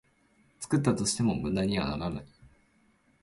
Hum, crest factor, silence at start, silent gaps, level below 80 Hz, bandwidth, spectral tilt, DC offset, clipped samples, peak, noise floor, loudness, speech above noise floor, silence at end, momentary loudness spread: none; 20 dB; 0.6 s; none; -52 dBFS; 11.5 kHz; -5 dB/octave; under 0.1%; under 0.1%; -12 dBFS; -67 dBFS; -29 LUFS; 38 dB; 0.75 s; 11 LU